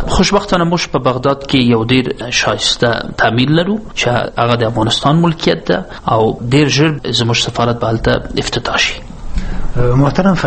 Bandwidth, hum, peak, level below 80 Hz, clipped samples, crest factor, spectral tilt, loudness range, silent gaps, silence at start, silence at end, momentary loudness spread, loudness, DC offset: 8.8 kHz; none; 0 dBFS; -26 dBFS; under 0.1%; 14 dB; -5 dB/octave; 2 LU; none; 0 s; 0 s; 6 LU; -13 LUFS; under 0.1%